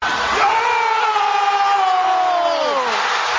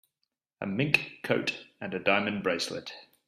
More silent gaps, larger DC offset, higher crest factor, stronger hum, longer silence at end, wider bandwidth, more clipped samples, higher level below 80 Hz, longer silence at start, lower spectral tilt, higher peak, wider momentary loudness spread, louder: neither; neither; second, 14 dB vs 24 dB; neither; second, 0 s vs 0.25 s; second, 7.6 kHz vs 14.5 kHz; neither; first, -52 dBFS vs -70 dBFS; second, 0 s vs 0.6 s; second, -1 dB/octave vs -4.5 dB/octave; first, -2 dBFS vs -6 dBFS; second, 2 LU vs 14 LU; first, -16 LUFS vs -29 LUFS